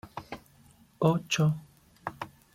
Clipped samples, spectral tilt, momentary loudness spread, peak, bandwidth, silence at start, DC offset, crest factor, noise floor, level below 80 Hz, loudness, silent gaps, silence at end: under 0.1%; -5.5 dB/octave; 18 LU; -10 dBFS; 15.5 kHz; 0.05 s; under 0.1%; 22 dB; -59 dBFS; -64 dBFS; -29 LUFS; none; 0.25 s